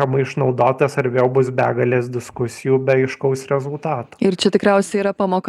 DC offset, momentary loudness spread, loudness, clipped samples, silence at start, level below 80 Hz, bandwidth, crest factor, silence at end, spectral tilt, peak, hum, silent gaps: under 0.1%; 8 LU; -18 LUFS; under 0.1%; 0 s; -60 dBFS; 12.5 kHz; 16 dB; 0 s; -6.5 dB/octave; 0 dBFS; none; none